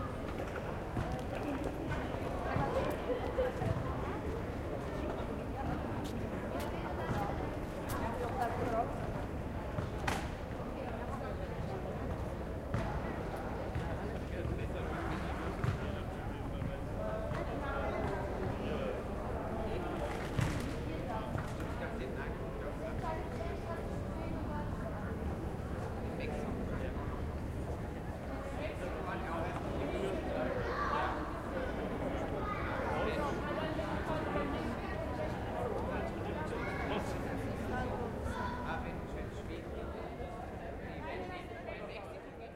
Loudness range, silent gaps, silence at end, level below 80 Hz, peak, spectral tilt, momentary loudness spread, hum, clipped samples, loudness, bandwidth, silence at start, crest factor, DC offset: 3 LU; none; 0 s; -46 dBFS; -20 dBFS; -7 dB/octave; 6 LU; none; under 0.1%; -39 LUFS; 16 kHz; 0 s; 18 dB; under 0.1%